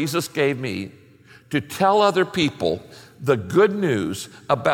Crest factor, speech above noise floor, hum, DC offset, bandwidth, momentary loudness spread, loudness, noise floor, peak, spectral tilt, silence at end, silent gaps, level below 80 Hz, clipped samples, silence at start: 18 dB; 29 dB; none; under 0.1%; 17 kHz; 11 LU; -21 LUFS; -50 dBFS; -4 dBFS; -5 dB/octave; 0 s; none; -58 dBFS; under 0.1%; 0 s